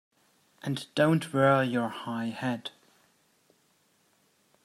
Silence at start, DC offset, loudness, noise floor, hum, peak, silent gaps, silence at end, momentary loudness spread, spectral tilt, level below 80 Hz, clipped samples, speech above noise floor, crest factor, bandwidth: 0.65 s; under 0.1%; -28 LUFS; -69 dBFS; none; -10 dBFS; none; 1.95 s; 13 LU; -6.5 dB/octave; -74 dBFS; under 0.1%; 41 dB; 20 dB; 14.5 kHz